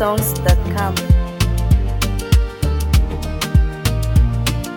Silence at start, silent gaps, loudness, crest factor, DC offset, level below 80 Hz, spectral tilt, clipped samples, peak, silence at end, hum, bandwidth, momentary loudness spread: 0 s; none; -18 LUFS; 14 dB; under 0.1%; -18 dBFS; -5.5 dB/octave; under 0.1%; -2 dBFS; 0 s; none; 18.5 kHz; 4 LU